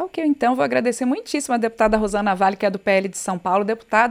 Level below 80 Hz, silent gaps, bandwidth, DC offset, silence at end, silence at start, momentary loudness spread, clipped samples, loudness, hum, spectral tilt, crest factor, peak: -46 dBFS; none; 15.5 kHz; under 0.1%; 0 s; 0 s; 4 LU; under 0.1%; -20 LUFS; none; -4.5 dB/octave; 18 dB; -2 dBFS